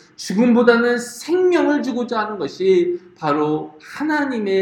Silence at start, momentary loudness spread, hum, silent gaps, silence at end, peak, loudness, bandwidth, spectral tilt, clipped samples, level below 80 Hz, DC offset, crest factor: 0.2 s; 11 LU; none; none; 0 s; 0 dBFS; -18 LUFS; 13.5 kHz; -5.5 dB/octave; under 0.1%; -64 dBFS; under 0.1%; 18 dB